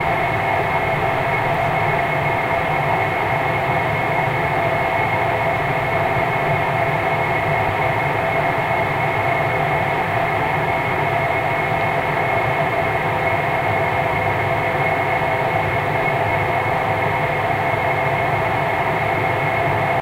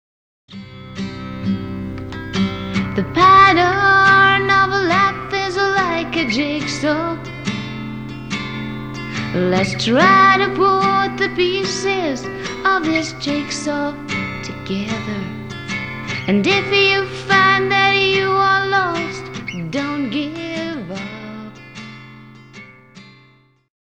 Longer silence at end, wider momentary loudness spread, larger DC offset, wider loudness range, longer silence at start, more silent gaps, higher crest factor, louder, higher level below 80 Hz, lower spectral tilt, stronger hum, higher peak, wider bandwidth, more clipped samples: second, 0 s vs 0.85 s; second, 1 LU vs 17 LU; neither; second, 0 LU vs 12 LU; second, 0 s vs 0.5 s; neither; second, 12 dB vs 18 dB; second, -19 LUFS vs -16 LUFS; about the same, -42 dBFS vs -46 dBFS; first, -6.5 dB/octave vs -4.5 dB/octave; neither; second, -6 dBFS vs 0 dBFS; about the same, 16 kHz vs 16.5 kHz; neither